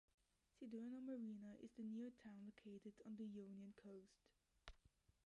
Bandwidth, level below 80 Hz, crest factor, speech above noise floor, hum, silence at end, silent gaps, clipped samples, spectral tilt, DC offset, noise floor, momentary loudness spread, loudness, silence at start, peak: 10.5 kHz; -80 dBFS; 18 dB; 23 dB; none; 0.15 s; none; under 0.1%; -7 dB/octave; under 0.1%; -79 dBFS; 12 LU; -57 LUFS; 0.6 s; -40 dBFS